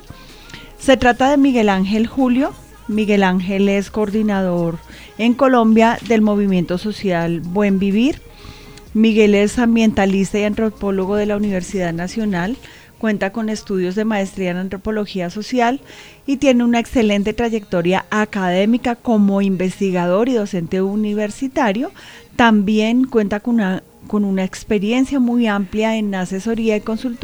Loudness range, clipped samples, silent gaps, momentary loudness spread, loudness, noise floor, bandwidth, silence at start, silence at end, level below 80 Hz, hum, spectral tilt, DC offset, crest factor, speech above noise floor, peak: 5 LU; under 0.1%; none; 10 LU; -17 LUFS; -38 dBFS; over 20 kHz; 0.1 s; 0 s; -42 dBFS; none; -6 dB/octave; 0.4%; 16 dB; 22 dB; 0 dBFS